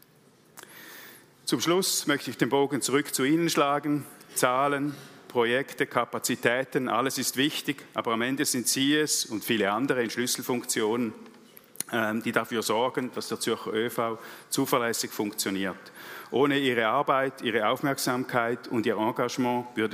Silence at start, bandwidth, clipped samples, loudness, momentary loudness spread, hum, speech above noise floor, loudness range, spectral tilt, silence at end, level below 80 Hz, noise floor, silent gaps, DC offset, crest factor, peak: 0.55 s; 16 kHz; under 0.1%; -27 LUFS; 8 LU; none; 32 dB; 3 LU; -3.5 dB/octave; 0 s; -78 dBFS; -59 dBFS; none; under 0.1%; 22 dB; -6 dBFS